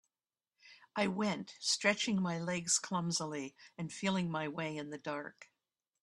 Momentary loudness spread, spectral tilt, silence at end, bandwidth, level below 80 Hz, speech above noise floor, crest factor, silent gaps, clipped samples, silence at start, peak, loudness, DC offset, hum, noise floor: 12 LU; -3.5 dB/octave; 0.6 s; 12.5 kHz; -76 dBFS; over 53 dB; 22 dB; none; under 0.1%; 0.65 s; -14 dBFS; -36 LUFS; under 0.1%; none; under -90 dBFS